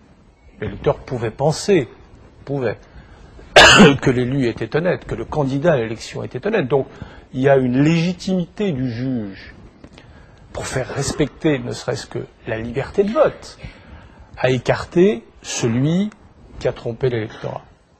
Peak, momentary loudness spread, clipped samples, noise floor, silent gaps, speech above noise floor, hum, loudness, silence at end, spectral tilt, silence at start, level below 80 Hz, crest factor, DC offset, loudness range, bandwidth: 0 dBFS; 16 LU; under 0.1%; -48 dBFS; none; 30 dB; none; -18 LUFS; 0.4 s; -5 dB/octave; 0.6 s; -42 dBFS; 20 dB; under 0.1%; 10 LU; 13 kHz